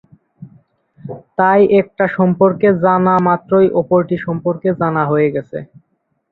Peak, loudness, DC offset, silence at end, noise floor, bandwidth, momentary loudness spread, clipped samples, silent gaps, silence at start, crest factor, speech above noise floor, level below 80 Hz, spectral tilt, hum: -2 dBFS; -14 LUFS; under 0.1%; 0.65 s; -66 dBFS; 4.2 kHz; 13 LU; under 0.1%; none; 0.4 s; 14 dB; 53 dB; -54 dBFS; -11 dB/octave; none